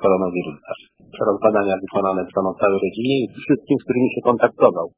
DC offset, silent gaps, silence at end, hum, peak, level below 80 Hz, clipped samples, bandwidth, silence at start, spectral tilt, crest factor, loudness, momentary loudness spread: under 0.1%; none; 0.1 s; none; 0 dBFS; -56 dBFS; under 0.1%; 4 kHz; 0 s; -10.5 dB/octave; 20 dB; -20 LUFS; 9 LU